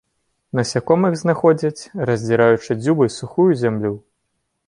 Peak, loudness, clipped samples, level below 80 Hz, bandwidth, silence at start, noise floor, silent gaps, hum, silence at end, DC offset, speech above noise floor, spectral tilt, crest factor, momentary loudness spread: -2 dBFS; -18 LUFS; under 0.1%; -56 dBFS; 11 kHz; 0.55 s; -72 dBFS; none; none; 0.7 s; under 0.1%; 55 dB; -6.5 dB/octave; 16 dB; 9 LU